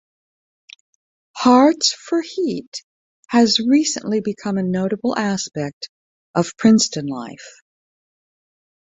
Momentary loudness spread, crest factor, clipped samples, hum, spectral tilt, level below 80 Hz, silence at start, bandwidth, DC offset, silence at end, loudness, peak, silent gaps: 20 LU; 18 dB; under 0.1%; none; -4 dB/octave; -62 dBFS; 1.35 s; 8 kHz; under 0.1%; 1.35 s; -18 LUFS; -2 dBFS; 2.67-2.72 s, 2.83-3.23 s, 5.73-5.81 s, 5.89-6.34 s